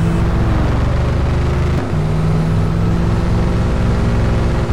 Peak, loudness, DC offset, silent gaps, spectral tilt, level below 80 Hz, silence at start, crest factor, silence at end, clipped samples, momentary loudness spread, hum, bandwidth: -6 dBFS; -16 LUFS; 4%; none; -8 dB/octave; -20 dBFS; 0 s; 8 dB; 0 s; under 0.1%; 1 LU; none; 11 kHz